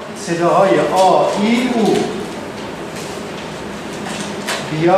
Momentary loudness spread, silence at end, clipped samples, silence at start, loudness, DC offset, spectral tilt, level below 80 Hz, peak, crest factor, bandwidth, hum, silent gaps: 14 LU; 0 s; under 0.1%; 0 s; -17 LUFS; under 0.1%; -5 dB/octave; -50 dBFS; -2 dBFS; 16 dB; 15.5 kHz; none; none